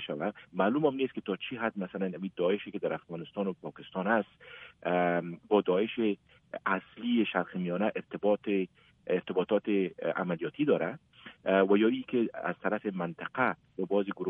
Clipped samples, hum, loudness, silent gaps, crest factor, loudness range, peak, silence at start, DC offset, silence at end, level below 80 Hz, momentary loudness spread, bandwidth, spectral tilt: under 0.1%; none; -31 LUFS; none; 20 dB; 4 LU; -12 dBFS; 0 s; under 0.1%; 0 s; -74 dBFS; 11 LU; 3.8 kHz; -9.5 dB/octave